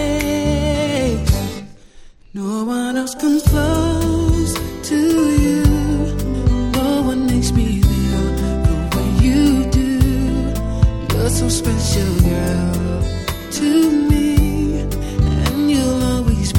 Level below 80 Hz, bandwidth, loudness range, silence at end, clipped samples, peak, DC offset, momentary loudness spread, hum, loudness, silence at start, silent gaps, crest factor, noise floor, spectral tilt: -22 dBFS; 18 kHz; 3 LU; 0 s; under 0.1%; 0 dBFS; under 0.1%; 7 LU; none; -17 LUFS; 0 s; none; 16 dB; -40 dBFS; -6 dB/octave